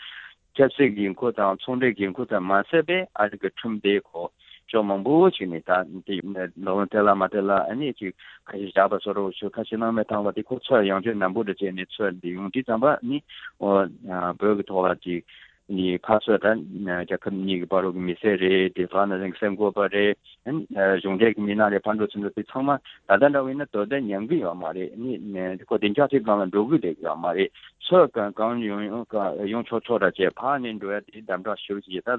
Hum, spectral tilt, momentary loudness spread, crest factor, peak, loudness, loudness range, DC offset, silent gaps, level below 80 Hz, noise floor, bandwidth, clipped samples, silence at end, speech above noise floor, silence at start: none; -9 dB/octave; 11 LU; 20 dB; -4 dBFS; -24 LUFS; 3 LU; under 0.1%; none; -62 dBFS; -44 dBFS; 4.2 kHz; under 0.1%; 0 s; 20 dB; 0 s